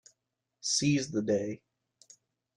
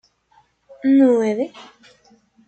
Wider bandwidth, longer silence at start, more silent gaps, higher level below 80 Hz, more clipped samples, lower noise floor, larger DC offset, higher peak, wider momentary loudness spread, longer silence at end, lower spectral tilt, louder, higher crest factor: first, 12 kHz vs 8.4 kHz; second, 0.65 s vs 0.85 s; neither; about the same, -68 dBFS vs -68 dBFS; neither; first, -84 dBFS vs -59 dBFS; neither; second, -16 dBFS vs -6 dBFS; about the same, 12 LU vs 12 LU; first, 1 s vs 0.85 s; second, -4 dB/octave vs -6.5 dB/octave; second, -30 LUFS vs -18 LUFS; about the same, 18 dB vs 16 dB